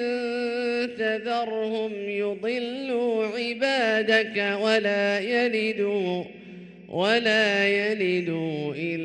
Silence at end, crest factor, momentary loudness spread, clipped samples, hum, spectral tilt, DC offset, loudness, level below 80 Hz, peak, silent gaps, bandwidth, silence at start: 0 s; 18 dB; 9 LU; under 0.1%; none; -5 dB/octave; under 0.1%; -25 LUFS; -70 dBFS; -8 dBFS; none; 9.8 kHz; 0 s